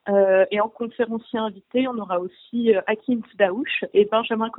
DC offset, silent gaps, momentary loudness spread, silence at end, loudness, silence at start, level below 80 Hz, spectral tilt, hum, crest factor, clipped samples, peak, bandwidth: under 0.1%; none; 9 LU; 0 s; -22 LUFS; 0.05 s; -68 dBFS; -10 dB/octave; none; 16 dB; under 0.1%; -4 dBFS; 4.1 kHz